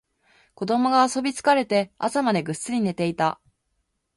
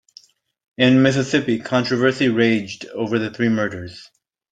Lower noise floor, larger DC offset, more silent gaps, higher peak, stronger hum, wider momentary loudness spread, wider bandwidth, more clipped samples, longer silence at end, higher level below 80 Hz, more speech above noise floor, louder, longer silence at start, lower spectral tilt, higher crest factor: first, -74 dBFS vs -50 dBFS; neither; neither; second, -6 dBFS vs -2 dBFS; neither; second, 6 LU vs 11 LU; first, 11.5 kHz vs 9.2 kHz; neither; first, 0.8 s vs 0.45 s; second, -64 dBFS vs -58 dBFS; first, 52 dB vs 31 dB; second, -23 LUFS vs -19 LUFS; second, 0.6 s vs 0.8 s; about the same, -5 dB/octave vs -6 dB/octave; about the same, 18 dB vs 18 dB